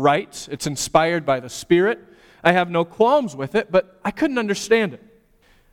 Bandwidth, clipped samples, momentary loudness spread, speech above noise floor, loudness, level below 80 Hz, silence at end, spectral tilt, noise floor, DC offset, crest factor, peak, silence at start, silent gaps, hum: 17 kHz; under 0.1%; 9 LU; 37 dB; -20 LUFS; -52 dBFS; 0.75 s; -4.5 dB/octave; -56 dBFS; under 0.1%; 18 dB; -2 dBFS; 0 s; none; none